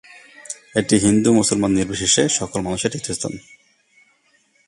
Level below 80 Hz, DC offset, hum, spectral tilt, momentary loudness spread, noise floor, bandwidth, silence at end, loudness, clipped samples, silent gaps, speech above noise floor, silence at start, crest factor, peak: -48 dBFS; under 0.1%; none; -3.5 dB/octave; 13 LU; -60 dBFS; 11.5 kHz; 1.3 s; -18 LUFS; under 0.1%; none; 42 dB; 0.4 s; 20 dB; -2 dBFS